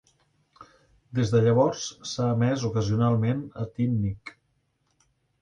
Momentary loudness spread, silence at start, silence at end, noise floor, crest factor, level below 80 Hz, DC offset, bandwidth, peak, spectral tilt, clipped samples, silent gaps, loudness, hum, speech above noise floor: 12 LU; 0.6 s; 1.1 s; -72 dBFS; 16 dB; -54 dBFS; under 0.1%; 9.2 kHz; -10 dBFS; -7 dB/octave; under 0.1%; none; -26 LUFS; none; 47 dB